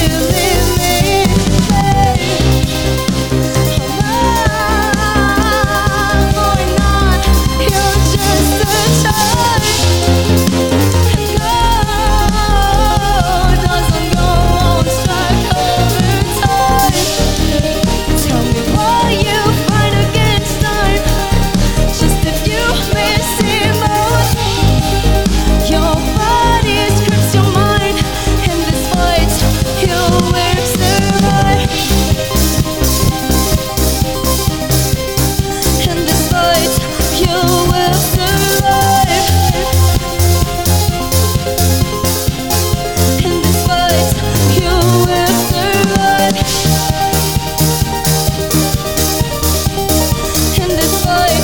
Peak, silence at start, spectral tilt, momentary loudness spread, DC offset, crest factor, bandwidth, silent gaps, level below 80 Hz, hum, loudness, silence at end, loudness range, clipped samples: 0 dBFS; 0 s; -4.5 dB/octave; 3 LU; 2%; 12 dB; over 20 kHz; none; -20 dBFS; none; -12 LUFS; 0 s; 2 LU; under 0.1%